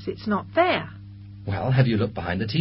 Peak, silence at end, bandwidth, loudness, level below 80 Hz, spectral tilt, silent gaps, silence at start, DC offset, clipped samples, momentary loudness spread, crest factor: -6 dBFS; 0 s; 5.8 kHz; -24 LUFS; -46 dBFS; -11.5 dB/octave; none; 0 s; under 0.1%; under 0.1%; 18 LU; 18 dB